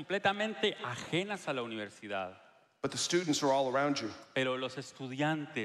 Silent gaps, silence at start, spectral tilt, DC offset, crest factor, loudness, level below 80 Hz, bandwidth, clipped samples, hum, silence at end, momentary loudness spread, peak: none; 0 s; -4 dB/octave; under 0.1%; 18 dB; -34 LUFS; -76 dBFS; 13 kHz; under 0.1%; none; 0 s; 11 LU; -16 dBFS